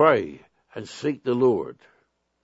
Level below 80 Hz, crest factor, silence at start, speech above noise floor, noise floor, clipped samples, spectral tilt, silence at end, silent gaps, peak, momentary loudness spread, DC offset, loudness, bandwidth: -66 dBFS; 22 dB; 0 s; 45 dB; -68 dBFS; under 0.1%; -6.5 dB/octave; 0.7 s; none; -2 dBFS; 18 LU; under 0.1%; -24 LUFS; 8 kHz